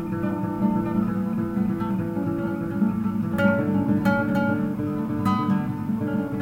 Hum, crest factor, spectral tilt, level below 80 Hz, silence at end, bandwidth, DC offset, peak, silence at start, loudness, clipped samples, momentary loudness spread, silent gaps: none; 14 dB; -9 dB/octave; -50 dBFS; 0 s; 16 kHz; under 0.1%; -8 dBFS; 0 s; -24 LUFS; under 0.1%; 5 LU; none